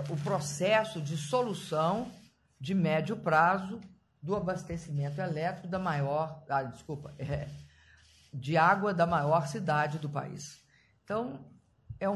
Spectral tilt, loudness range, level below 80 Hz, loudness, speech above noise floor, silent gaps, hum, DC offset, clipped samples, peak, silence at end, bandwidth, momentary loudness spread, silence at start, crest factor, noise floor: -6 dB/octave; 5 LU; -60 dBFS; -31 LUFS; 30 dB; none; none; under 0.1%; under 0.1%; -12 dBFS; 0 s; 12.5 kHz; 17 LU; 0 s; 20 dB; -61 dBFS